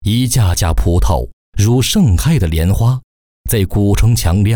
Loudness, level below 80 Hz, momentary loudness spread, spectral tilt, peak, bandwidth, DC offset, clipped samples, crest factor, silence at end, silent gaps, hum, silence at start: -14 LUFS; -20 dBFS; 6 LU; -5.5 dB/octave; -4 dBFS; over 20 kHz; under 0.1%; under 0.1%; 10 dB; 0 s; 1.33-1.52 s, 3.04-3.44 s; none; 0 s